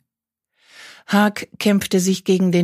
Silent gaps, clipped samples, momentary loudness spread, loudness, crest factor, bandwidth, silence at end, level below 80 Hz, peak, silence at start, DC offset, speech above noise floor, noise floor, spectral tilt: none; under 0.1%; 3 LU; -18 LUFS; 18 dB; 15.5 kHz; 0 s; -62 dBFS; -2 dBFS; 0.8 s; under 0.1%; 67 dB; -84 dBFS; -5.5 dB/octave